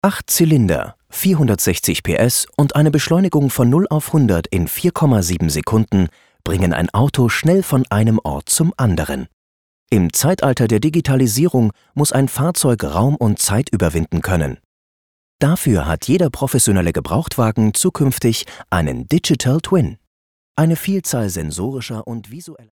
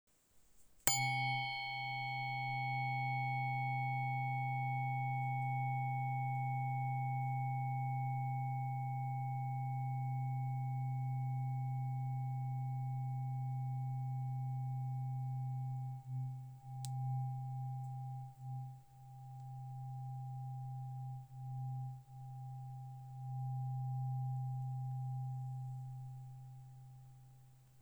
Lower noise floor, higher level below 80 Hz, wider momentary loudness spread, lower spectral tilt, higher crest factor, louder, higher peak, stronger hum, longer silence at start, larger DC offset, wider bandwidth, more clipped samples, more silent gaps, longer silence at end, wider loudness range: first, under -90 dBFS vs -68 dBFS; first, -36 dBFS vs -74 dBFS; second, 9 LU vs 12 LU; about the same, -5.5 dB/octave vs -4.5 dB/octave; second, 16 dB vs 34 dB; first, -16 LUFS vs -41 LUFS; first, 0 dBFS vs -6 dBFS; neither; second, 0.05 s vs 0.35 s; first, 0.4% vs under 0.1%; about the same, 19.5 kHz vs over 20 kHz; neither; first, 9.33-9.87 s, 14.65-15.39 s, 20.07-20.55 s vs none; first, 0.15 s vs 0 s; second, 3 LU vs 9 LU